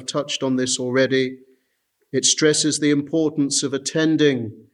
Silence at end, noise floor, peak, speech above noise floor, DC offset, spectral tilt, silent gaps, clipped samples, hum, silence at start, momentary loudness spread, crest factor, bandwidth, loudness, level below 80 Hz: 0.1 s; -69 dBFS; -2 dBFS; 49 dB; under 0.1%; -3.5 dB/octave; none; under 0.1%; none; 0 s; 7 LU; 18 dB; 12 kHz; -20 LUFS; -70 dBFS